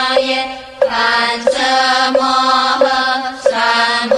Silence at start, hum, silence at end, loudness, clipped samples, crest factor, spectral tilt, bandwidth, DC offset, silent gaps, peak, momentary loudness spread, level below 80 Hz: 0 s; none; 0 s; -13 LUFS; under 0.1%; 14 dB; -1.5 dB/octave; 12 kHz; under 0.1%; none; 0 dBFS; 5 LU; -50 dBFS